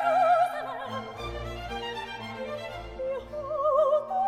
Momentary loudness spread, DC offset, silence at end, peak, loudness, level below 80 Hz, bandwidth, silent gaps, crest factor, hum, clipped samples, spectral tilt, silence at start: 13 LU; under 0.1%; 0 s; -14 dBFS; -29 LUFS; -48 dBFS; 15 kHz; none; 16 dB; none; under 0.1%; -5 dB/octave; 0 s